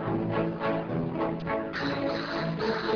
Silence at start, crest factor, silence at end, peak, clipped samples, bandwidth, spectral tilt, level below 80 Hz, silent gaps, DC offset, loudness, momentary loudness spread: 0 s; 14 dB; 0 s; -16 dBFS; under 0.1%; 5.4 kHz; -7.5 dB/octave; -54 dBFS; none; under 0.1%; -30 LUFS; 2 LU